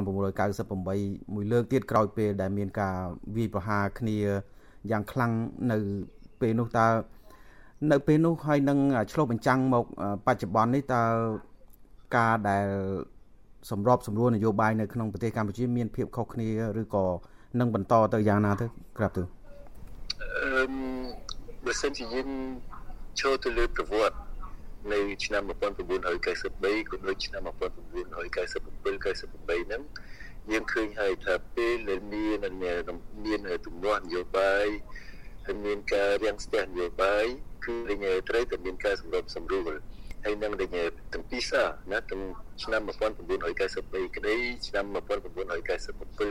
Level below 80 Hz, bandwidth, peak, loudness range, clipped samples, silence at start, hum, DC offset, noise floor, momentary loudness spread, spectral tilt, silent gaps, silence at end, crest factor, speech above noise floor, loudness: -44 dBFS; 16 kHz; -8 dBFS; 6 LU; under 0.1%; 0 s; none; 0.6%; -54 dBFS; 12 LU; -6 dB/octave; none; 0 s; 20 dB; 25 dB; -29 LUFS